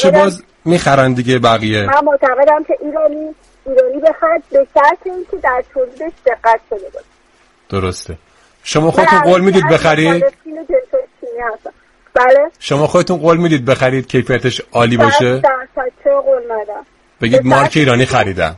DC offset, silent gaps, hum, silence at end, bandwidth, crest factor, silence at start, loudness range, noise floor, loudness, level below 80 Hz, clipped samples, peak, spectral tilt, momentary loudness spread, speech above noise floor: under 0.1%; none; none; 0 s; 11.5 kHz; 12 dB; 0 s; 4 LU; -51 dBFS; -13 LUFS; -44 dBFS; under 0.1%; 0 dBFS; -5.5 dB/octave; 13 LU; 39 dB